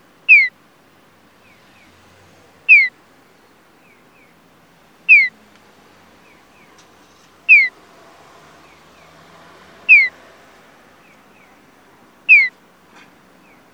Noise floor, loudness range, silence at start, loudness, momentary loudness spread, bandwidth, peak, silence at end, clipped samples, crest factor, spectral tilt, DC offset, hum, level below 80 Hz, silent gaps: -51 dBFS; 3 LU; 0.3 s; -10 LUFS; 16 LU; 9 kHz; 0 dBFS; 1.25 s; under 0.1%; 20 dB; -1.5 dB/octave; under 0.1%; none; -70 dBFS; none